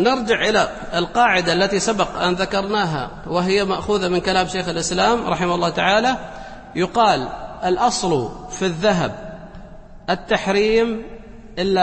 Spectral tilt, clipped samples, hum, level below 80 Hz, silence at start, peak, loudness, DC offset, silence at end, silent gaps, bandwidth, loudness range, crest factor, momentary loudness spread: -4 dB/octave; under 0.1%; none; -42 dBFS; 0 s; -2 dBFS; -19 LUFS; under 0.1%; 0 s; none; 8.8 kHz; 3 LU; 18 dB; 13 LU